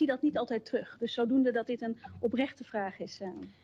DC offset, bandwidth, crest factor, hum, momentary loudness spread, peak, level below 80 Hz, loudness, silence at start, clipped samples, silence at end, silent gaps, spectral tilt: under 0.1%; 7.4 kHz; 14 dB; none; 12 LU; -18 dBFS; -72 dBFS; -33 LUFS; 0 s; under 0.1%; 0.15 s; none; -6 dB/octave